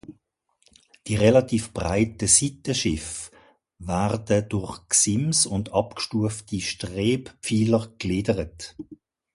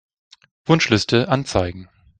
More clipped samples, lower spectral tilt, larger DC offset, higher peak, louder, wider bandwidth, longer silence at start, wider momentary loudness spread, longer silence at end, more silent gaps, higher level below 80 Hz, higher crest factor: neither; about the same, -4 dB/octave vs -5 dB/octave; neither; second, -4 dBFS vs 0 dBFS; second, -23 LUFS vs -19 LUFS; first, 11.5 kHz vs 9.4 kHz; second, 0.1 s vs 0.7 s; about the same, 17 LU vs 15 LU; about the same, 0.4 s vs 0.35 s; neither; about the same, -46 dBFS vs -46 dBFS; about the same, 22 dB vs 20 dB